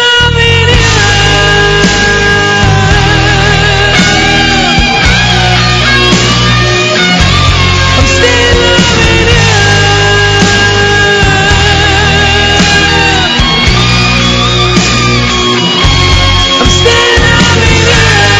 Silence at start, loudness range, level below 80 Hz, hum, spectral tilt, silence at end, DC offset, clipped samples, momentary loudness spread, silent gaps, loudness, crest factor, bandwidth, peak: 0 s; 1 LU; -16 dBFS; none; -3.5 dB/octave; 0 s; under 0.1%; 3%; 2 LU; none; -5 LUFS; 6 dB; 11 kHz; 0 dBFS